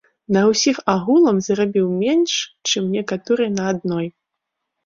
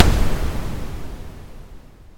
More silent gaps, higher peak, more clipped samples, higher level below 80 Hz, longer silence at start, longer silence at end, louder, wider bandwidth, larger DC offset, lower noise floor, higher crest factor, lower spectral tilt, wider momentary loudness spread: neither; about the same, -2 dBFS vs 0 dBFS; second, under 0.1% vs 0.1%; second, -60 dBFS vs -24 dBFS; first, 0.3 s vs 0 s; first, 0.75 s vs 0.05 s; first, -18 LUFS vs -25 LUFS; second, 7.6 kHz vs 17 kHz; neither; first, -79 dBFS vs -40 dBFS; about the same, 16 dB vs 20 dB; about the same, -4.5 dB/octave vs -5.5 dB/octave; second, 8 LU vs 22 LU